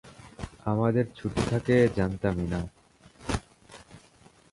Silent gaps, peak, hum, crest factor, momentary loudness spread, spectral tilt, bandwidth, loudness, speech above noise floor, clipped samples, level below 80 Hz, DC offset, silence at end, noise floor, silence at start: none; -10 dBFS; none; 18 dB; 20 LU; -7 dB/octave; 11.5 kHz; -28 LUFS; 32 dB; under 0.1%; -46 dBFS; under 0.1%; 0.55 s; -58 dBFS; 0.05 s